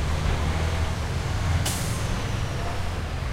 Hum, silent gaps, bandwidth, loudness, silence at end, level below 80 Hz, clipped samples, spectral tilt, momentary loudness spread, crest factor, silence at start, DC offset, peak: none; none; 16 kHz; -27 LUFS; 0 s; -30 dBFS; under 0.1%; -5 dB/octave; 5 LU; 14 dB; 0 s; under 0.1%; -12 dBFS